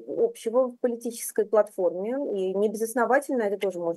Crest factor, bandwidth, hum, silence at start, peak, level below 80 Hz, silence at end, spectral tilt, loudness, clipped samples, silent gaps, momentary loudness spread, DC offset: 16 dB; 13 kHz; none; 0 s; -10 dBFS; -88 dBFS; 0 s; -4.5 dB/octave; -26 LUFS; under 0.1%; none; 6 LU; under 0.1%